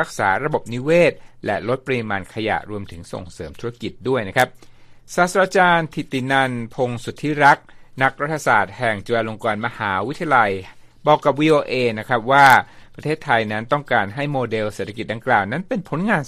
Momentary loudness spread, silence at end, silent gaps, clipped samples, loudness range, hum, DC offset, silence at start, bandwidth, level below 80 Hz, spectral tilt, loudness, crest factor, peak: 13 LU; 0 s; none; under 0.1%; 7 LU; none; under 0.1%; 0 s; 15 kHz; -50 dBFS; -5.5 dB/octave; -19 LUFS; 20 dB; 0 dBFS